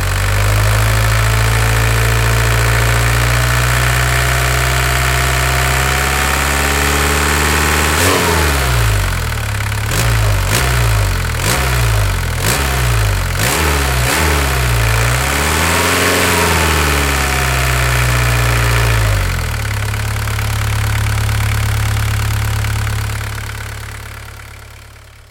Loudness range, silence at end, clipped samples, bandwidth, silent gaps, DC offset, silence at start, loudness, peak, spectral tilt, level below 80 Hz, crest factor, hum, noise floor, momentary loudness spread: 4 LU; 0.4 s; under 0.1%; 17.5 kHz; none; under 0.1%; 0 s; -14 LUFS; 0 dBFS; -3.5 dB/octave; -20 dBFS; 14 dB; none; -37 dBFS; 6 LU